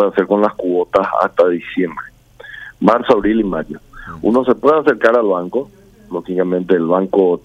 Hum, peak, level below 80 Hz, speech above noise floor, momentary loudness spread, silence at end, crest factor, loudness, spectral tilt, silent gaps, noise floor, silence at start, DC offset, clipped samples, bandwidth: none; 0 dBFS; -46 dBFS; 22 dB; 18 LU; 0.05 s; 14 dB; -15 LUFS; -8 dB/octave; none; -37 dBFS; 0 s; under 0.1%; under 0.1%; 8.6 kHz